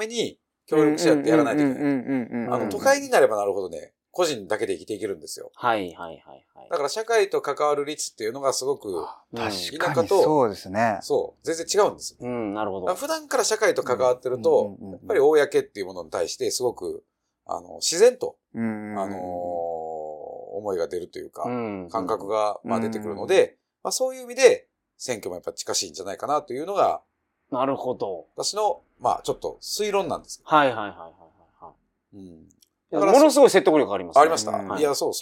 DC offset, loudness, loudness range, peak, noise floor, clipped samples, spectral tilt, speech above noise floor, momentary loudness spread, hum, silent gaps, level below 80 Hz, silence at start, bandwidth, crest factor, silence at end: under 0.1%; -24 LUFS; 6 LU; -2 dBFS; -50 dBFS; under 0.1%; -3.5 dB/octave; 27 dB; 14 LU; none; none; -66 dBFS; 0 s; 17 kHz; 22 dB; 0 s